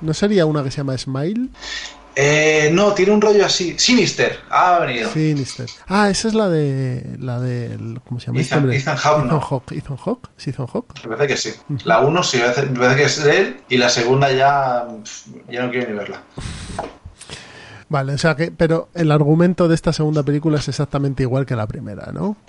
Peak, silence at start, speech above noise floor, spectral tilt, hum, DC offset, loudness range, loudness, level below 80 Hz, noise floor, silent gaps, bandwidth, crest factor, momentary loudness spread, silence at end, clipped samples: -2 dBFS; 0 s; 22 dB; -5 dB/octave; none; under 0.1%; 6 LU; -17 LUFS; -46 dBFS; -40 dBFS; none; 11 kHz; 16 dB; 15 LU; 0.15 s; under 0.1%